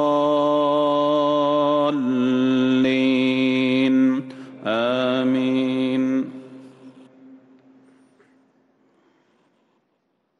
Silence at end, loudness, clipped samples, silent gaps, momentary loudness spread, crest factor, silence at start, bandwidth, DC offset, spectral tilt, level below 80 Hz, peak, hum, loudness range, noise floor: 3.05 s; -20 LUFS; under 0.1%; none; 7 LU; 12 dB; 0 s; 6.6 kHz; under 0.1%; -6.5 dB/octave; -68 dBFS; -10 dBFS; none; 9 LU; -70 dBFS